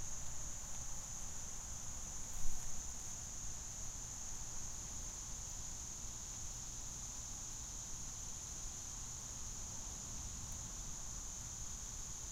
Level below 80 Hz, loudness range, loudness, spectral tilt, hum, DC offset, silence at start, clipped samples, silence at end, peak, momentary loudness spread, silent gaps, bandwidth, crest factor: -50 dBFS; 0 LU; -45 LUFS; -2 dB/octave; none; under 0.1%; 0 s; under 0.1%; 0 s; -22 dBFS; 0 LU; none; 16 kHz; 20 dB